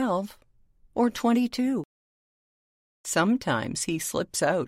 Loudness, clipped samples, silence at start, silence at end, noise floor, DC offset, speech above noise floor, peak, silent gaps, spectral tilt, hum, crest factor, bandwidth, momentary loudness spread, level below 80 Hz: -27 LUFS; under 0.1%; 0 s; 0 s; -60 dBFS; under 0.1%; 34 dB; -10 dBFS; 1.85-3.04 s; -4.5 dB/octave; none; 16 dB; 16 kHz; 11 LU; -60 dBFS